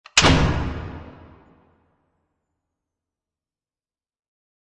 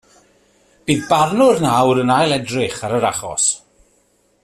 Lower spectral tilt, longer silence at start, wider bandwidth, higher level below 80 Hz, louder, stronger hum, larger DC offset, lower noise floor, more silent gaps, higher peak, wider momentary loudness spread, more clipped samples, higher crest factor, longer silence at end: about the same, -3.5 dB/octave vs -4 dB/octave; second, 0.15 s vs 0.85 s; second, 11.5 kHz vs 14 kHz; first, -36 dBFS vs -52 dBFS; second, -19 LUFS vs -16 LUFS; neither; neither; first, under -90 dBFS vs -59 dBFS; neither; about the same, -2 dBFS vs -2 dBFS; first, 22 LU vs 8 LU; neither; first, 24 dB vs 16 dB; first, 3.55 s vs 0.85 s